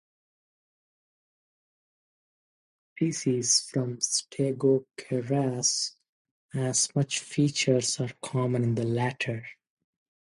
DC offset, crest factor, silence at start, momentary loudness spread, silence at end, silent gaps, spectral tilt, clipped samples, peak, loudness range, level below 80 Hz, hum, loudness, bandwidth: under 0.1%; 18 dB; 3 s; 9 LU; 0.85 s; 6.09-6.25 s, 6.31-6.49 s; -4 dB/octave; under 0.1%; -10 dBFS; 4 LU; -70 dBFS; none; -27 LUFS; 11.5 kHz